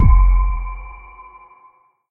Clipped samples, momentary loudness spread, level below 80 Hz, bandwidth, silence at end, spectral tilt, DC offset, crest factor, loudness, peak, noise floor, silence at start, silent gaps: under 0.1%; 26 LU; -16 dBFS; 2.5 kHz; 1.15 s; -11.5 dB/octave; under 0.1%; 16 dB; -19 LUFS; -2 dBFS; -53 dBFS; 0 s; none